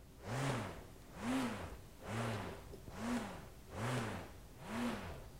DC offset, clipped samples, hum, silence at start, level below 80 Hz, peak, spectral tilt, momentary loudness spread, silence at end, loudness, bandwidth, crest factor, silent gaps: under 0.1%; under 0.1%; none; 0 s; -58 dBFS; -26 dBFS; -5.5 dB/octave; 13 LU; 0 s; -43 LUFS; 16 kHz; 18 dB; none